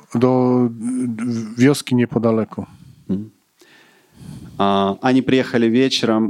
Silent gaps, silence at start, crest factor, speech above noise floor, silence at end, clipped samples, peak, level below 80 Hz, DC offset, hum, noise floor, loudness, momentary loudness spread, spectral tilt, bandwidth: none; 0.1 s; 16 dB; 34 dB; 0 s; under 0.1%; -2 dBFS; -56 dBFS; under 0.1%; none; -51 dBFS; -18 LUFS; 17 LU; -6 dB/octave; 12.5 kHz